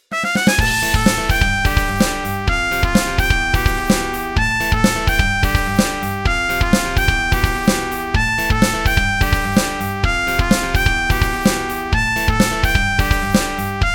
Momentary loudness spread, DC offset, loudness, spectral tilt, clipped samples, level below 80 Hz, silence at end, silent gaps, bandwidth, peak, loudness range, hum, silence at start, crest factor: 4 LU; under 0.1%; -17 LUFS; -4 dB/octave; under 0.1%; -22 dBFS; 0 s; none; 18 kHz; 0 dBFS; 1 LU; none; 0.1 s; 16 dB